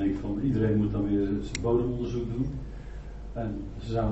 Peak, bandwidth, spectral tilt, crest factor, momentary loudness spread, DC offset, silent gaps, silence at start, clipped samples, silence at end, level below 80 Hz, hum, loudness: -14 dBFS; 8 kHz; -8 dB/octave; 14 dB; 15 LU; under 0.1%; none; 0 s; under 0.1%; 0 s; -40 dBFS; none; -29 LUFS